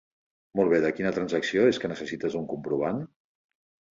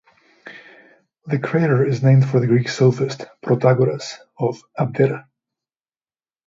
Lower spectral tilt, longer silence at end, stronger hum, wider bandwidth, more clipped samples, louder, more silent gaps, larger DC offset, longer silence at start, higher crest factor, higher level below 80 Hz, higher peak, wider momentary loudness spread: second, -6 dB/octave vs -7.5 dB/octave; second, 0.9 s vs 1.25 s; neither; about the same, 7.8 kHz vs 7.6 kHz; neither; second, -27 LUFS vs -18 LUFS; neither; neither; about the same, 0.55 s vs 0.45 s; about the same, 20 dB vs 18 dB; about the same, -64 dBFS vs -60 dBFS; second, -8 dBFS vs -2 dBFS; second, 10 LU vs 15 LU